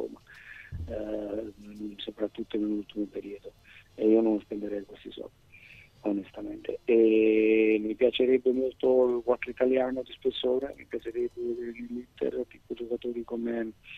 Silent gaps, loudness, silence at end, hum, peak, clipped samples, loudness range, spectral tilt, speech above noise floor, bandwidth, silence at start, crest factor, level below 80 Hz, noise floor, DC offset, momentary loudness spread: none; -29 LUFS; 0 s; none; -10 dBFS; under 0.1%; 10 LU; -7.5 dB/octave; 25 dB; 6.2 kHz; 0 s; 18 dB; -58 dBFS; -53 dBFS; under 0.1%; 20 LU